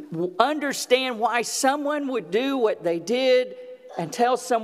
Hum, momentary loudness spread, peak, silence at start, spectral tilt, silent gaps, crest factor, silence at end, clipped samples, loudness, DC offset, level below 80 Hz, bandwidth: none; 10 LU; -2 dBFS; 0 s; -3 dB/octave; none; 22 dB; 0 s; under 0.1%; -23 LUFS; under 0.1%; -78 dBFS; 15.5 kHz